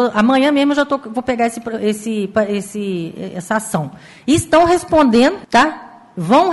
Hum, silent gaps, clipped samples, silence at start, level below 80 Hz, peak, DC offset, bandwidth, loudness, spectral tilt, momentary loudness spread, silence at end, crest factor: none; none; under 0.1%; 0 s; -46 dBFS; -2 dBFS; under 0.1%; 12 kHz; -16 LUFS; -5 dB/octave; 14 LU; 0 s; 14 dB